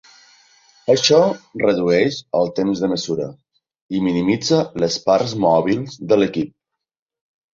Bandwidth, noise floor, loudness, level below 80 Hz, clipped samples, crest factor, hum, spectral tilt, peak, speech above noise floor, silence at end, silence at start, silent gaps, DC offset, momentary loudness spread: 7.6 kHz; -53 dBFS; -18 LUFS; -56 dBFS; under 0.1%; 16 dB; none; -5 dB/octave; -2 dBFS; 36 dB; 1.1 s; 0.85 s; 3.81-3.89 s; under 0.1%; 10 LU